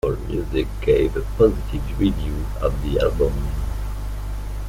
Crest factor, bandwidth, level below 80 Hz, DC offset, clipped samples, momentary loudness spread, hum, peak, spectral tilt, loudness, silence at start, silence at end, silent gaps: 18 dB; 16 kHz; -26 dBFS; under 0.1%; under 0.1%; 11 LU; 50 Hz at -25 dBFS; -4 dBFS; -7.5 dB/octave; -23 LUFS; 0.05 s; 0 s; none